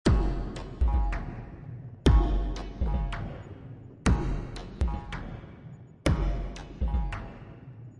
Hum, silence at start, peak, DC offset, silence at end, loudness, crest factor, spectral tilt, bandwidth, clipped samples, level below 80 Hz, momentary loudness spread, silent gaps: none; 0.05 s; -10 dBFS; under 0.1%; 0 s; -31 LUFS; 20 dB; -7 dB/octave; 11.5 kHz; under 0.1%; -30 dBFS; 19 LU; none